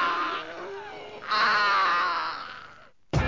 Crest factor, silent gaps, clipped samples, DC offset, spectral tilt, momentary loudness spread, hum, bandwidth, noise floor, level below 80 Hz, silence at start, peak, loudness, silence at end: 16 dB; none; under 0.1%; 0.2%; -4.5 dB/octave; 18 LU; none; 7.6 kHz; -51 dBFS; -44 dBFS; 0 s; -12 dBFS; -25 LUFS; 0 s